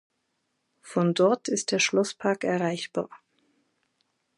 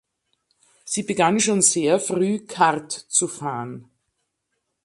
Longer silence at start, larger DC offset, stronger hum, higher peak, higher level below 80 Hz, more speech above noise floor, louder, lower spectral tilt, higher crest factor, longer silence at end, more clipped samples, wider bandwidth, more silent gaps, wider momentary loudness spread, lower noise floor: about the same, 0.85 s vs 0.85 s; neither; neither; second, -8 dBFS vs -2 dBFS; second, -78 dBFS vs -68 dBFS; second, 51 dB vs 55 dB; second, -26 LUFS vs -20 LUFS; about the same, -4 dB/octave vs -3 dB/octave; about the same, 20 dB vs 20 dB; first, 1.2 s vs 1 s; neither; about the same, 11.5 kHz vs 12 kHz; neither; about the same, 10 LU vs 12 LU; about the same, -77 dBFS vs -77 dBFS